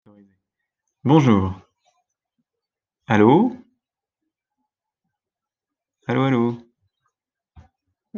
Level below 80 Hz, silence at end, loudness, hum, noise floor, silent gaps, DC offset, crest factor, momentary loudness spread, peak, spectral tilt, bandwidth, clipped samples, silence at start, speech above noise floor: -64 dBFS; 0 s; -19 LUFS; none; -89 dBFS; none; under 0.1%; 20 dB; 18 LU; -2 dBFS; -8 dB/octave; 7 kHz; under 0.1%; 1.05 s; 72 dB